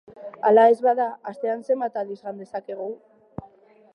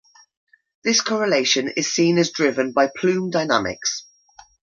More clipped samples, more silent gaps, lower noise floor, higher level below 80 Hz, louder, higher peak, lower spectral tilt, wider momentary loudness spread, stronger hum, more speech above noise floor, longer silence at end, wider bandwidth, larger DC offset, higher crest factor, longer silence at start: neither; neither; about the same, -53 dBFS vs -51 dBFS; second, -66 dBFS vs -60 dBFS; about the same, -22 LUFS vs -20 LUFS; second, -6 dBFS vs -2 dBFS; first, -7 dB/octave vs -3.5 dB/octave; first, 25 LU vs 7 LU; neither; about the same, 31 dB vs 31 dB; second, 0.5 s vs 0.75 s; first, 10.5 kHz vs 7.6 kHz; neither; about the same, 18 dB vs 20 dB; second, 0.1 s vs 0.85 s